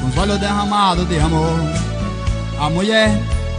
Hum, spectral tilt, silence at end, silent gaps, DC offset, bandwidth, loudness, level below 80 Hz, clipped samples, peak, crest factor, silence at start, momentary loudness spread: none; -5.5 dB/octave; 0 s; none; under 0.1%; 10 kHz; -17 LUFS; -26 dBFS; under 0.1%; -2 dBFS; 16 dB; 0 s; 8 LU